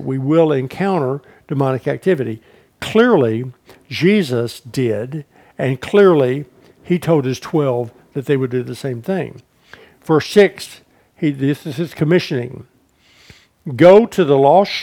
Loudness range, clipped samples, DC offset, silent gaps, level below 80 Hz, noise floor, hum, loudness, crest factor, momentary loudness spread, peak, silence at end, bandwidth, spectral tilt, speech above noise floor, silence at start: 4 LU; under 0.1%; under 0.1%; none; -58 dBFS; -53 dBFS; none; -16 LUFS; 16 dB; 17 LU; 0 dBFS; 0 s; 16 kHz; -7 dB/octave; 38 dB; 0 s